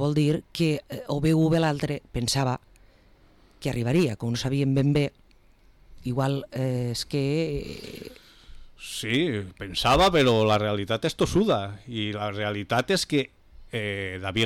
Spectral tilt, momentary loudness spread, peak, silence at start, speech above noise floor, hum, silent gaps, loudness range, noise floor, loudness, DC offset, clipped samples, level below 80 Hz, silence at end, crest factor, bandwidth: -5.5 dB/octave; 12 LU; -12 dBFS; 0 s; 31 dB; none; none; 6 LU; -56 dBFS; -25 LUFS; under 0.1%; under 0.1%; -46 dBFS; 0 s; 12 dB; 16 kHz